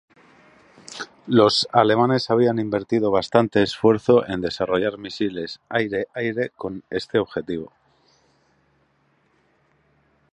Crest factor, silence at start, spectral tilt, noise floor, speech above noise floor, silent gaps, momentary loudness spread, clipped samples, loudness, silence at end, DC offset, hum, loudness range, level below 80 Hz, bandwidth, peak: 22 dB; 0.9 s; -6 dB/octave; -64 dBFS; 43 dB; none; 15 LU; under 0.1%; -21 LUFS; 2.65 s; under 0.1%; none; 12 LU; -56 dBFS; 10.5 kHz; 0 dBFS